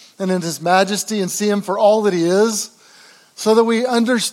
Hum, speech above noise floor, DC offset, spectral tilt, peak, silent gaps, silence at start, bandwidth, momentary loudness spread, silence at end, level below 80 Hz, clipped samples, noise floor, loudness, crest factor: none; 31 dB; under 0.1%; -4 dB/octave; 0 dBFS; none; 0.2 s; 17 kHz; 7 LU; 0 s; -82 dBFS; under 0.1%; -47 dBFS; -17 LUFS; 16 dB